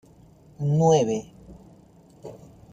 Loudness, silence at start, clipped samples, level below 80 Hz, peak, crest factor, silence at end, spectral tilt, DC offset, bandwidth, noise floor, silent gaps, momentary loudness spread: -22 LUFS; 0.6 s; under 0.1%; -56 dBFS; -8 dBFS; 20 dB; 0.35 s; -7 dB/octave; under 0.1%; 9 kHz; -53 dBFS; none; 25 LU